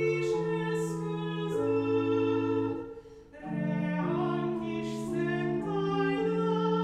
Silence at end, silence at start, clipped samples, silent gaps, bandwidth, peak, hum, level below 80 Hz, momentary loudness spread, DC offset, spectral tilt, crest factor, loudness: 0 s; 0 s; under 0.1%; none; 12.5 kHz; -18 dBFS; none; -62 dBFS; 6 LU; under 0.1%; -7.5 dB/octave; 12 dB; -31 LUFS